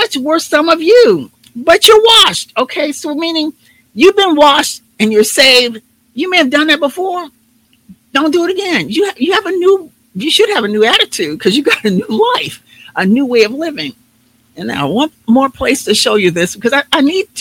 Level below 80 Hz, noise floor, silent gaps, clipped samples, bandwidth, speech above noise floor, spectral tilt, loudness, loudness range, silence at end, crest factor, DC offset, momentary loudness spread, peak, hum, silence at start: -50 dBFS; -53 dBFS; none; 1%; over 20 kHz; 42 dB; -3 dB/octave; -11 LUFS; 6 LU; 0 s; 12 dB; under 0.1%; 13 LU; 0 dBFS; none; 0 s